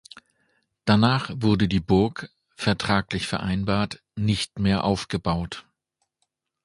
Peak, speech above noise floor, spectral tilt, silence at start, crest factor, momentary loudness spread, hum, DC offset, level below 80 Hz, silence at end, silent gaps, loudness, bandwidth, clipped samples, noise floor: -4 dBFS; 55 dB; -6 dB/octave; 0.85 s; 22 dB; 10 LU; none; under 0.1%; -44 dBFS; 1.05 s; none; -24 LUFS; 11.5 kHz; under 0.1%; -78 dBFS